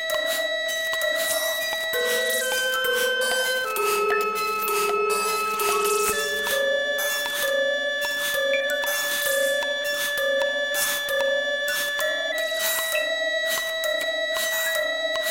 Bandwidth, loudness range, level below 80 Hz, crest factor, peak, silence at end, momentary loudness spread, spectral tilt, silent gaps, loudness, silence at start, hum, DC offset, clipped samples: 17 kHz; 1 LU; -62 dBFS; 18 dB; -8 dBFS; 0 s; 2 LU; 0.5 dB/octave; none; -23 LUFS; 0 s; none; 0.1%; under 0.1%